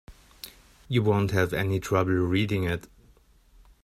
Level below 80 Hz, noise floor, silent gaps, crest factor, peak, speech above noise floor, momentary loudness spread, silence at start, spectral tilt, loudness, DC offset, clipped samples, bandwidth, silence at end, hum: -52 dBFS; -58 dBFS; none; 20 dB; -8 dBFS; 33 dB; 20 LU; 0.1 s; -6.5 dB/octave; -26 LUFS; under 0.1%; under 0.1%; 15 kHz; 1.05 s; none